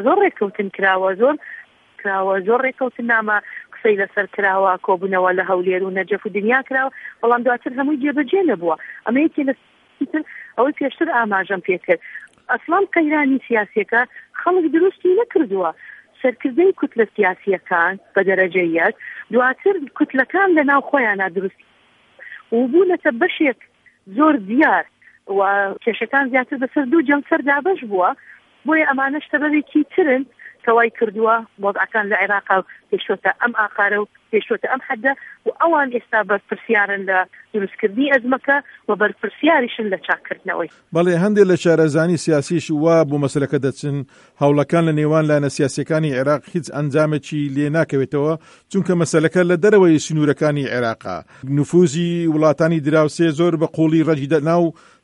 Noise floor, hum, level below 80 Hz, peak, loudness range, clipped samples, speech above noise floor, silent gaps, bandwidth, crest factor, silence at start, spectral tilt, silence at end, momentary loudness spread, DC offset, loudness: -53 dBFS; none; -66 dBFS; 0 dBFS; 3 LU; under 0.1%; 35 dB; none; 11 kHz; 16 dB; 0 s; -6.5 dB/octave; 0.3 s; 8 LU; under 0.1%; -18 LUFS